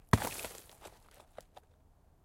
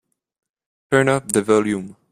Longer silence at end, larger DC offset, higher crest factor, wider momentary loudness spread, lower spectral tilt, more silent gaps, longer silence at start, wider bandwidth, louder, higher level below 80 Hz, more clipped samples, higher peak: first, 1.35 s vs 0.2 s; neither; first, 28 dB vs 20 dB; first, 28 LU vs 7 LU; about the same, -5 dB/octave vs -5 dB/octave; neither; second, 0.15 s vs 0.9 s; first, 17 kHz vs 15 kHz; second, -36 LUFS vs -19 LUFS; first, -52 dBFS vs -58 dBFS; neither; second, -10 dBFS vs 0 dBFS